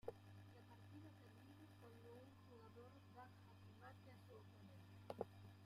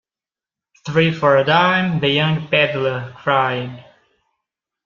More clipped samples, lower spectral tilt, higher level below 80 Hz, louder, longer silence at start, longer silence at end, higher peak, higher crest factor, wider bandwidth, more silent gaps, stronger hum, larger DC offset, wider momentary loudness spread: neither; about the same, -7 dB/octave vs -6.5 dB/octave; second, -84 dBFS vs -56 dBFS; second, -62 LUFS vs -17 LUFS; second, 0.05 s vs 0.85 s; second, 0 s vs 1.05 s; second, -32 dBFS vs -2 dBFS; first, 30 dB vs 18 dB; first, 15.5 kHz vs 7.2 kHz; neither; neither; neither; about the same, 10 LU vs 10 LU